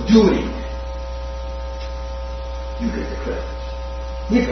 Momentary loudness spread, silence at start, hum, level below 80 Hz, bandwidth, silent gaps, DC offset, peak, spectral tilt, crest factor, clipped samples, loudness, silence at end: 12 LU; 0 s; none; -28 dBFS; 6.4 kHz; none; under 0.1%; 0 dBFS; -7 dB/octave; 20 dB; under 0.1%; -24 LUFS; 0 s